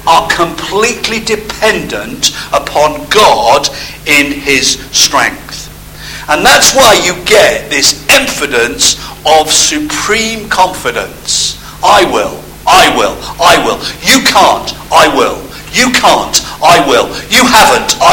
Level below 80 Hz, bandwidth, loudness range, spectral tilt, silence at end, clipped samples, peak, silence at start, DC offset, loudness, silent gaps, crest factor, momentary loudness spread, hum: -34 dBFS; over 20 kHz; 3 LU; -1.5 dB/octave; 0 s; 3%; 0 dBFS; 0 s; under 0.1%; -8 LUFS; none; 8 dB; 10 LU; 50 Hz at -35 dBFS